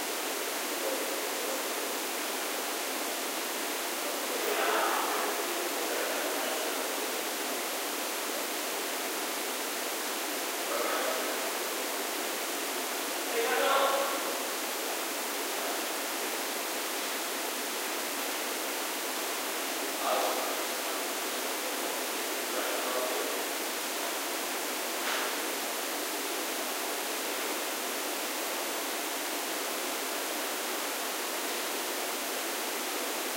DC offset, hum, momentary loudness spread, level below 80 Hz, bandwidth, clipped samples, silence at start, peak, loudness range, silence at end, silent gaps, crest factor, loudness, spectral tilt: under 0.1%; none; 3 LU; under -90 dBFS; 16 kHz; under 0.1%; 0 s; -16 dBFS; 2 LU; 0 s; none; 18 dB; -31 LUFS; 0.5 dB/octave